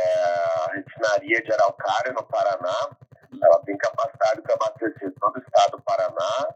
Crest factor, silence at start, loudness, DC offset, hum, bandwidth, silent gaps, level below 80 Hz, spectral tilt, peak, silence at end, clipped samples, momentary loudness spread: 18 dB; 0 s; -23 LUFS; under 0.1%; none; 8.2 kHz; none; -80 dBFS; -3.5 dB/octave; -4 dBFS; 0 s; under 0.1%; 7 LU